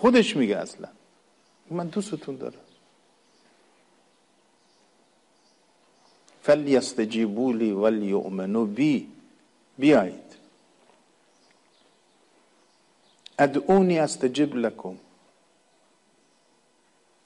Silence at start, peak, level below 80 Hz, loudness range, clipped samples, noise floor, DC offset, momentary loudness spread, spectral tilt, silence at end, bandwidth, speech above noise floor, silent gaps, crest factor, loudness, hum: 0 s; -8 dBFS; -68 dBFS; 13 LU; under 0.1%; -64 dBFS; under 0.1%; 19 LU; -5.5 dB/octave; 2.3 s; 11.5 kHz; 41 dB; none; 18 dB; -24 LUFS; none